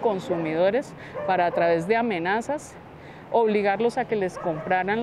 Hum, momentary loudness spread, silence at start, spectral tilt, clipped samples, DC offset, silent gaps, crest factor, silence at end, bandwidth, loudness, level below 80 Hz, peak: none; 12 LU; 0 s; -6 dB/octave; under 0.1%; under 0.1%; none; 16 dB; 0 s; 12 kHz; -24 LUFS; -60 dBFS; -8 dBFS